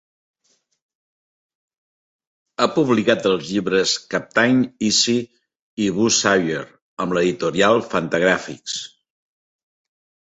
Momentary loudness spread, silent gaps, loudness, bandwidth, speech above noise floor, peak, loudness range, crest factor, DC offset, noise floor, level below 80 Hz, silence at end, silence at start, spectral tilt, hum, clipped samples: 12 LU; 5.61-5.77 s, 6.82-6.97 s; -19 LUFS; 8.2 kHz; 48 dB; -2 dBFS; 4 LU; 20 dB; under 0.1%; -67 dBFS; -58 dBFS; 1.4 s; 2.6 s; -3.5 dB/octave; none; under 0.1%